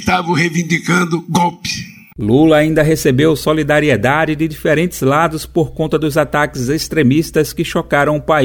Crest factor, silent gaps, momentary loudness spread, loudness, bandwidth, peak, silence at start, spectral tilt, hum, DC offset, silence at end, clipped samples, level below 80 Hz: 14 dB; none; 6 LU; -14 LUFS; over 20 kHz; 0 dBFS; 0 s; -5.5 dB/octave; none; under 0.1%; 0 s; under 0.1%; -38 dBFS